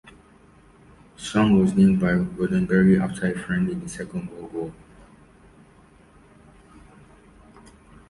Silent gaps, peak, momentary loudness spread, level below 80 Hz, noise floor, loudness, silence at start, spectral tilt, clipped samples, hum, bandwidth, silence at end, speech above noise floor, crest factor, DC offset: none; -6 dBFS; 16 LU; -48 dBFS; -53 dBFS; -22 LUFS; 1.2 s; -7 dB/octave; under 0.1%; none; 11.5 kHz; 3.4 s; 32 dB; 18 dB; under 0.1%